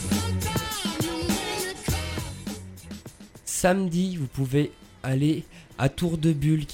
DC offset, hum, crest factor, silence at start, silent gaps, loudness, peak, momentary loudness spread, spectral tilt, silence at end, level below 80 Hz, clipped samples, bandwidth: under 0.1%; none; 20 dB; 0 s; none; -27 LUFS; -6 dBFS; 16 LU; -5 dB/octave; 0 s; -44 dBFS; under 0.1%; 16.5 kHz